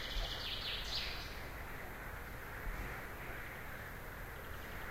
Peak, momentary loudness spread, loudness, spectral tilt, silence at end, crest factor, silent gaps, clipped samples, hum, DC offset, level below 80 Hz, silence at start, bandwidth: -26 dBFS; 8 LU; -44 LUFS; -3.5 dB/octave; 0 s; 18 dB; none; under 0.1%; none; under 0.1%; -50 dBFS; 0 s; 16 kHz